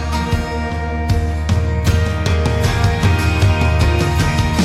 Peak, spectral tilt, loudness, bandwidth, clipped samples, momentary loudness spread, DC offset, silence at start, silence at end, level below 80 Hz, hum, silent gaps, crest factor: -2 dBFS; -6 dB/octave; -17 LUFS; 14.5 kHz; under 0.1%; 5 LU; under 0.1%; 0 s; 0 s; -20 dBFS; none; none; 12 dB